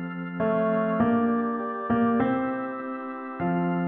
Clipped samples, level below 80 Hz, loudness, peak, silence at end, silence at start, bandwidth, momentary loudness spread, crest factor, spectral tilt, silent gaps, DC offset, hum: under 0.1%; -60 dBFS; -26 LUFS; -12 dBFS; 0 s; 0 s; 3.7 kHz; 10 LU; 14 dB; -11.5 dB/octave; none; under 0.1%; none